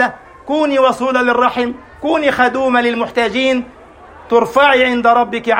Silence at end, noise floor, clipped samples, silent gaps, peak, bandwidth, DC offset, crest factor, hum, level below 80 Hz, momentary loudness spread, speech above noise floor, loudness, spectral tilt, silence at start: 0 s; -38 dBFS; under 0.1%; none; 0 dBFS; 16 kHz; under 0.1%; 14 dB; none; -48 dBFS; 10 LU; 25 dB; -14 LUFS; -4 dB/octave; 0 s